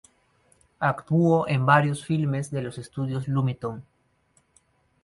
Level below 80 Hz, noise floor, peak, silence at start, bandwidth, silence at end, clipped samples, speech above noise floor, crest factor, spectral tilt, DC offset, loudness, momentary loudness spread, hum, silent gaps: -60 dBFS; -66 dBFS; -4 dBFS; 0.8 s; 11.5 kHz; 1.25 s; under 0.1%; 42 dB; 22 dB; -7.5 dB/octave; under 0.1%; -25 LUFS; 13 LU; none; none